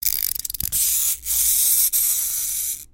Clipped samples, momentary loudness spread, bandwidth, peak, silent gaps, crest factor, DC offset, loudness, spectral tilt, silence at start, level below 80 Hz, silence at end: under 0.1%; 8 LU; 17 kHz; 0 dBFS; none; 20 dB; under 0.1%; -18 LUFS; 2 dB/octave; 0 s; -46 dBFS; 0.05 s